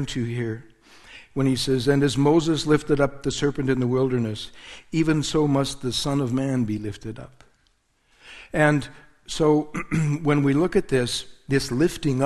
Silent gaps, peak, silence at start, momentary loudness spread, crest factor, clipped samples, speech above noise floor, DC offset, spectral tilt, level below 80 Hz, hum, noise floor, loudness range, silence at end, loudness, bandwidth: none; -4 dBFS; 0 s; 13 LU; 20 dB; under 0.1%; 43 dB; under 0.1%; -6 dB/octave; -46 dBFS; none; -65 dBFS; 4 LU; 0 s; -23 LUFS; 12.5 kHz